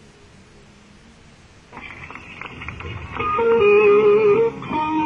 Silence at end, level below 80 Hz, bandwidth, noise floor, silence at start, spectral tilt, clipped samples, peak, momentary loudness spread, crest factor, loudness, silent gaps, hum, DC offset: 0 s; -46 dBFS; 6.8 kHz; -47 dBFS; 1.75 s; -7 dB/octave; under 0.1%; -6 dBFS; 22 LU; 14 dB; -16 LUFS; none; none; under 0.1%